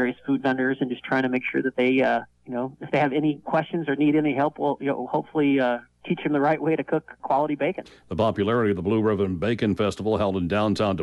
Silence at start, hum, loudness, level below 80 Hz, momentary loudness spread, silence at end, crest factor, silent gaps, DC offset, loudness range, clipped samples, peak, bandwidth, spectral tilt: 0 s; none; -24 LUFS; -56 dBFS; 7 LU; 0 s; 14 dB; none; under 0.1%; 1 LU; under 0.1%; -10 dBFS; 11.5 kHz; -7.5 dB/octave